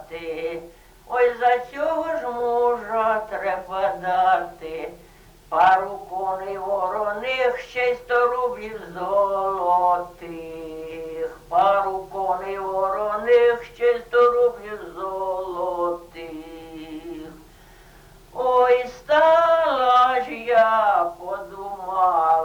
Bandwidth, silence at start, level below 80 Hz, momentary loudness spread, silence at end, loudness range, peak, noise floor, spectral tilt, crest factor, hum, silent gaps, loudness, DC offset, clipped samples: 19.5 kHz; 0 s; -54 dBFS; 17 LU; 0 s; 6 LU; -8 dBFS; -49 dBFS; -4.5 dB/octave; 14 dB; none; none; -21 LUFS; under 0.1%; under 0.1%